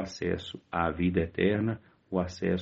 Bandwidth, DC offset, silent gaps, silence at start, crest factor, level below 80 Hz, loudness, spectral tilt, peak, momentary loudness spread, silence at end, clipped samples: 7.6 kHz; under 0.1%; none; 0 s; 18 dB; -56 dBFS; -30 LUFS; -6 dB/octave; -12 dBFS; 8 LU; 0 s; under 0.1%